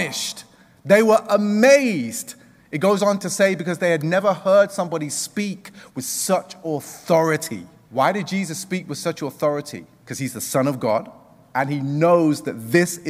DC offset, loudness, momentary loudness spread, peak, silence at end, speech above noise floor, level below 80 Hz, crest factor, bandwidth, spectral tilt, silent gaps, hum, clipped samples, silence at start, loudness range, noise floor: under 0.1%; -20 LUFS; 14 LU; -2 dBFS; 0 s; 25 dB; -66 dBFS; 18 dB; 16 kHz; -4.5 dB/octave; none; none; under 0.1%; 0 s; 6 LU; -45 dBFS